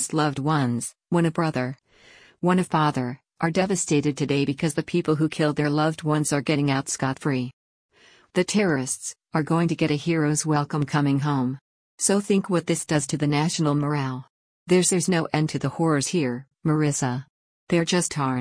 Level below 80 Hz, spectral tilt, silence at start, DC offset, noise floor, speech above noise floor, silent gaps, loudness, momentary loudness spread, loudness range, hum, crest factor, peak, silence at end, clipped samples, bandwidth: -60 dBFS; -5 dB/octave; 0 s; under 0.1%; -53 dBFS; 30 dB; 7.53-7.89 s, 11.61-11.98 s, 14.30-14.66 s, 17.30-17.67 s; -24 LUFS; 7 LU; 2 LU; none; 18 dB; -6 dBFS; 0 s; under 0.1%; 10.5 kHz